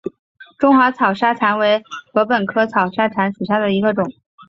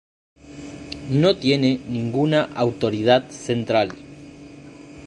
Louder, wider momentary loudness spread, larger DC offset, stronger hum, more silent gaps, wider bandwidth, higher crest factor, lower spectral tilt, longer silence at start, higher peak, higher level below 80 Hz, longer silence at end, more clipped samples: first, -17 LUFS vs -21 LUFS; second, 8 LU vs 24 LU; neither; neither; first, 0.19-0.35 s vs none; second, 7.4 kHz vs 11.5 kHz; about the same, 16 dB vs 20 dB; about the same, -7 dB/octave vs -6.5 dB/octave; second, 0.05 s vs 0.45 s; about the same, 0 dBFS vs -2 dBFS; second, -60 dBFS vs -52 dBFS; first, 0.4 s vs 0 s; neither